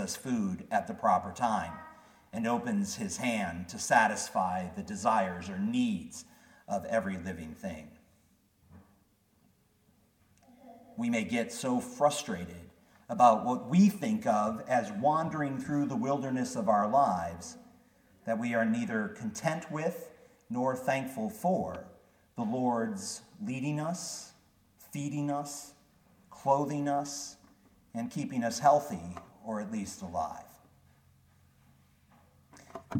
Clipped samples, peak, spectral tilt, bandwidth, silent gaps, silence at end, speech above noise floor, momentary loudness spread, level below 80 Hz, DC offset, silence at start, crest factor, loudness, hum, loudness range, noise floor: under 0.1%; -10 dBFS; -5 dB/octave; 17.5 kHz; none; 0 s; 37 dB; 18 LU; -66 dBFS; under 0.1%; 0 s; 24 dB; -32 LUFS; none; 11 LU; -68 dBFS